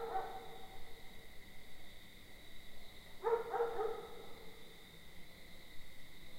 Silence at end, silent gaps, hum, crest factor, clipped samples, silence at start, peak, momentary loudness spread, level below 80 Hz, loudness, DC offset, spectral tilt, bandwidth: 0 s; none; none; 20 dB; under 0.1%; 0 s; -24 dBFS; 19 LU; -60 dBFS; -43 LUFS; under 0.1%; -4 dB/octave; 16 kHz